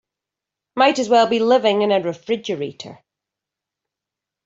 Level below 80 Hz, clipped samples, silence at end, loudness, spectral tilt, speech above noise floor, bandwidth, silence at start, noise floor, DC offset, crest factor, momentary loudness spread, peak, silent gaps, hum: -68 dBFS; under 0.1%; 1.5 s; -18 LUFS; -4.5 dB/octave; 68 dB; 7.8 kHz; 0.75 s; -86 dBFS; under 0.1%; 18 dB; 16 LU; -2 dBFS; none; none